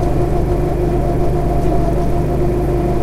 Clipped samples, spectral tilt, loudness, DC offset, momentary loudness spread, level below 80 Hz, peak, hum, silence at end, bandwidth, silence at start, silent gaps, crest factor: under 0.1%; -8.5 dB/octave; -17 LUFS; under 0.1%; 1 LU; -20 dBFS; -2 dBFS; 50 Hz at -20 dBFS; 0 s; 14 kHz; 0 s; none; 12 dB